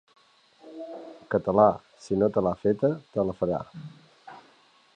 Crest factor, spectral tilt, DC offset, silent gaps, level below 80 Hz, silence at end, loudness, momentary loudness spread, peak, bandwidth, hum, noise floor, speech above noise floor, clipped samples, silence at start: 22 dB; -8.5 dB/octave; under 0.1%; none; -58 dBFS; 0.6 s; -26 LUFS; 22 LU; -6 dBFS; 9.6 kHz; none; -60 dBFS; 35 dB; under 0.1%; 0.65 s